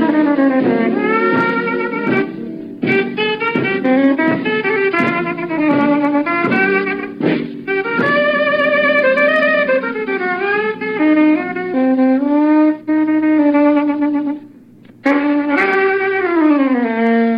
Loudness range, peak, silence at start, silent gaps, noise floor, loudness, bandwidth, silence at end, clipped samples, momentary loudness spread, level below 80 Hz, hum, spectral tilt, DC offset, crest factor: 2 LU; -2 dBFS; 0 s; none; -42 dBFS; -15 LUFS; 5.4 kHz; 0 s; under 0.1%; 7 LU; -66 dBFS; none; -7.5 dB/octave; under 0.1%; 14 dB